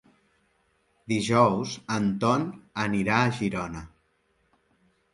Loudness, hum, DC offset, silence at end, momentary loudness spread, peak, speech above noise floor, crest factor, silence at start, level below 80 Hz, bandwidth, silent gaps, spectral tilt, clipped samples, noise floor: -26 LUFS; none; under 0.1%; 1.25 s; 12 LU; -6 dBFS; 44 dB; 22 dB; 1.1 s; -56 dBFS; 11.5 kHz; none; -5.5 dB/octave; under 0.1%; -70 dBFS